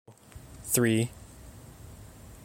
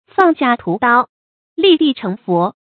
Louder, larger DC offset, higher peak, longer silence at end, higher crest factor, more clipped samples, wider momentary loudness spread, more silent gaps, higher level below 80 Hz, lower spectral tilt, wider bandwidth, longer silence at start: second, -27 LUFS vs -15 LUFS; neither; second, -10 dBFS vs 0 dBFS; about the same, 0.1 s vs 0.2 s; first, 22 dB vs 16 dB; neither; first, 24 LU vs 10 LU; second, none vs 1.09-1.56 s; first, -54 dBFS vs -60 dBFS; second, -4.5 dB/octave vs -8 dB/octave; first, 17 kHz vs 4.9 kHz; about the same, 0.1 s vs 0.2 s